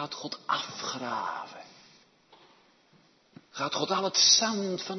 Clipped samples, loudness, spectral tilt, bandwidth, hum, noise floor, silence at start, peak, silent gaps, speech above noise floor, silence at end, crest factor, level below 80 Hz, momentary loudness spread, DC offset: under 0.1%; -26 LUFS; -1 dB/octave; 6.6 kHz; none; -63 dBFS; 0 s; -10 dBFS; none; 34 dB; 0 s; 22 dB; -80 dBFS; 21 LU; under 0.1%